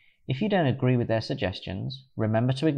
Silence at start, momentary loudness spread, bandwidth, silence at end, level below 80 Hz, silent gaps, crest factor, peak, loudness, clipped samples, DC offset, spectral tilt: 0.3 s; 10 LU; 9.4 kHz; 0 s; -60 dBFS; none; 16 dB; -12 dBFS; -27 LUFS; under 0.1%; under 0.1%; -8 dB/octave